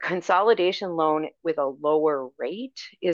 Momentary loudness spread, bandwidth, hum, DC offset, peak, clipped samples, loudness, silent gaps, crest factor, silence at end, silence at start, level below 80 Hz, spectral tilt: 12 LU; 7.4 kHz; none; under 0.1%; -8 dBFS; under 0.1%; -24 LUFS; none; 18 dB; 0 s; 0 s; -78 dBFS; -5.5 dB/octave